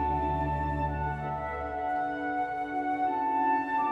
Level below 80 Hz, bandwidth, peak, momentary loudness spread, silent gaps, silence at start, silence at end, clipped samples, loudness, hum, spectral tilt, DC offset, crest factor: -42 dBFS; 7.8 kHz; -18 dBFS; 6 LU; none; 0 s; 0 s; under 0.1%; -30 LUFS; none; -8.5 dB/octave; under 0.1%; 12 dB